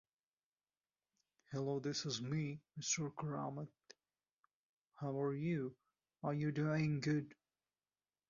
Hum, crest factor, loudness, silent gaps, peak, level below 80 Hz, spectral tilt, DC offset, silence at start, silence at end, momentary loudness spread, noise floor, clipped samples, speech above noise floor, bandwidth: none; 18 dB; -41 LUFS; 4.33-4.37 s, 4.54-4.85 s; -26 dBFS; -78 dBFS; -6 dB/octave; under 0.1%; 1.5 s; 0.95 s; 11 LU; under -90 dBFS; under 0.1%; over 50 dB; 7.2 kHz